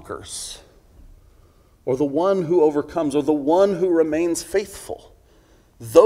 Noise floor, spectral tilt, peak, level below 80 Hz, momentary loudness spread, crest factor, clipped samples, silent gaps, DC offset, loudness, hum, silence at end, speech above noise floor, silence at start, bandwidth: -54 dBFS; -5.5 dB/octave; 0 dBFS; -52 dBFS; 17 LU; 20 dB; under 0.1%; none; under 0.1%; -20 LUFS; none; 0 s; 34 dB; 0.05 s; 16 kHz